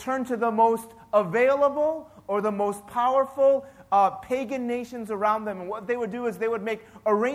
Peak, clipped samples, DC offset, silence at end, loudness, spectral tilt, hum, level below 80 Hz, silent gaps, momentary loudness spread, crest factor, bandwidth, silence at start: -8 dBFS; under 0.1%; under 0.1%; 0 s; -25 LUFS; -6 dB/octave; none; -66 dBFS; none; 9 LU; 16 dB; 15 kHz; 0 s